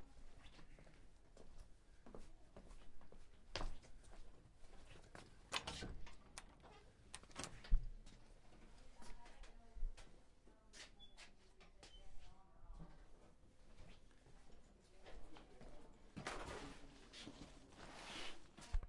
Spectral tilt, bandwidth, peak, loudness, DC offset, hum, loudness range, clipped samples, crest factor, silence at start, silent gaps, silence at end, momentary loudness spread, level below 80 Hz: -3.5 dB/octave; 11.5 kHz; -22 dBFS; -56 LUFS; under 0.1%; none; 13 LU; under 0.1%; 28 dB; 0 s; none; 0 s; 18 LU; -54 dBFS